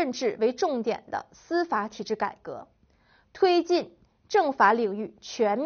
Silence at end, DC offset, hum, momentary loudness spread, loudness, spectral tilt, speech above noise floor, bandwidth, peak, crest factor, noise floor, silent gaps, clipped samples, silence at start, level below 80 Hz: 0 s; under 0.1%; none; 15 LU; -26 LUFS; -2.5 dB/octave; 37 dB; 6.8 kHz; -6 dBFS; 20 dB; -63 dBFS; none; under 0.1%; 0 s; -68 dBFS